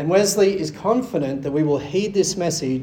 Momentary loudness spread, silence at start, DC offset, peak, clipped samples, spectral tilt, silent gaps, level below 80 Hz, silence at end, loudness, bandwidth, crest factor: 6 LU; 0 s; under 0.1%; -4 dBFS; under 0.1%; -4.5 dB/octave; none; -54 dBFS; 0 s; -20 LUFS; 17.5 kHz; 16 dB